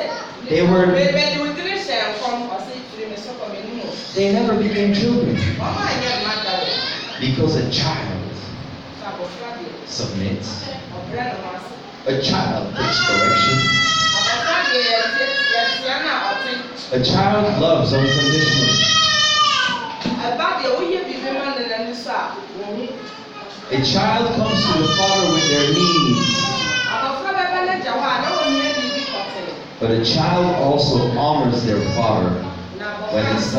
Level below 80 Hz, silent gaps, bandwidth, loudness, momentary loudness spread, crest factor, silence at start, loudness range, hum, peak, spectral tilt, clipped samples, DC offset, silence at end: -48 dBFS; none; 9.2 kHz; -18 LUFS; 15 LU; 16 dB; 0 s; 8 LU; none; -4 dBFS; -4 dB/octave; under 0.1%; under 0.1%; 0 s